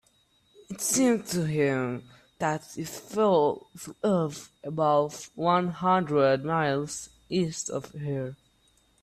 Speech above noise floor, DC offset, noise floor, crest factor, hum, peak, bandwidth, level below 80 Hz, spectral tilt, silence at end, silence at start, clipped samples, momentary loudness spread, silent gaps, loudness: 39 dB; under 0.1%; -66 dBFS; 18 dB; none; -10 dBFS; 16 kHz; -64 dBFS; -5 dB/octave; 0.7 s; 0.7 s; under 0.1%; 14 LU; none; -27 LUFS